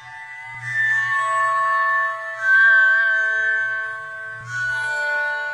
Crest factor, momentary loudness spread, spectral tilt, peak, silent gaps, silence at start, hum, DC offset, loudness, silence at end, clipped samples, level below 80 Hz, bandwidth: 14 dB; 18 LU; -1.5 dB/octave; -6 dBFS; none; 0 s; none; under 0.1%; -18 LUFS; 0 s; under 0.1%; -66 dBFS; 10.5 kHz